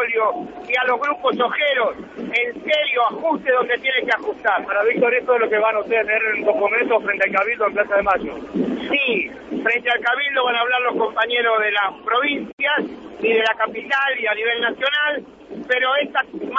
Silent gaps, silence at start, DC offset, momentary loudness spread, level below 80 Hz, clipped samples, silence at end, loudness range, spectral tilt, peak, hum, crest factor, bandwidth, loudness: 12.53-12.58 s; 0 s; under 0.1%; 5 LU; -58 dBFS; under 0.1%; 0 s; 2 LU; -4.5 dB/octave; -4 dBFS; none; 16 dB; 7.8 kHz; -19 LUFS